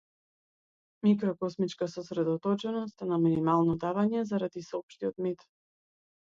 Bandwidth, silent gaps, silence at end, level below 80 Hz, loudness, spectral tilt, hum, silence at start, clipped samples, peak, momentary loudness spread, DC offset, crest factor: 7.6 kHz; 4.83-4.88 s; 1.05 s; -68 dBFS; -30 LUFS; -8 dB/octave; none; 1.05 s; under 0.1%; -14 dBFS; 9 LU; under 0.1%; 18 dB